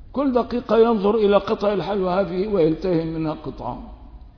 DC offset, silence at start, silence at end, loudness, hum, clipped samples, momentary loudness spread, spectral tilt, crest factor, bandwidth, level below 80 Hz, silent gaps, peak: under 0.1%; 0 s; 0.1 s; -21 LUFS; none; under 0.1%; 13 LU; -8.5 dB/octave; 16 dB; 5.4 kHz; -42 dBFS; none; -4 dBFS